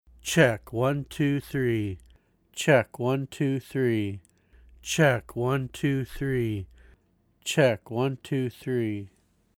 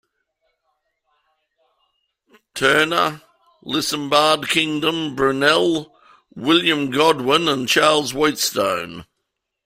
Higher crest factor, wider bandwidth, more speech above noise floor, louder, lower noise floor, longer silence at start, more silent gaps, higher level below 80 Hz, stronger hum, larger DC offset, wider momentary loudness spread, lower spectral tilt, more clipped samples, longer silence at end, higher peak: about the same, 20 dB vs 20 dB; about the same, 17.5 kHz vs 16 kHz; second, 40 dB vs 59 dB; second, -27 LUFS vs -18 LUFS; second, -66 dBFS vs -77 dBFS; second, 0.25 s vs 2.55 s; neither; about the same, -54 dBFS vs -58 dBFS; neither; neither; first, 13 LU vs 10 LU; first, -5.5 dB/octave vs -3 dB/octave; neither; second, 0.5 s vs 0.65 s; second, -6 dBFS vs -2 dBFS